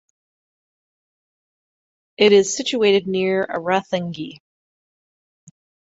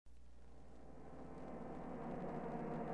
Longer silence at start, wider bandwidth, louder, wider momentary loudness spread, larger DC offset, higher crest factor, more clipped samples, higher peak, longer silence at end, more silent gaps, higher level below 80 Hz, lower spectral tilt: first, 2.2 s vs 0.05 s; second, 8 kHz vs 10 kHz; first, -18 LUFS vs -49 LUFS; second, 14 LU vs 18 LU; second, under 0.1% vs 0.2%; about the same, 20 dB vs 16 dB; neither; first, -2 dBFS vs -32 dBFS; first, 1.6 s vs 0 s; neither; about the same, -66 dBFS vs -62 dBFS; second, -4 dB/octave vs -8.5 dB/octave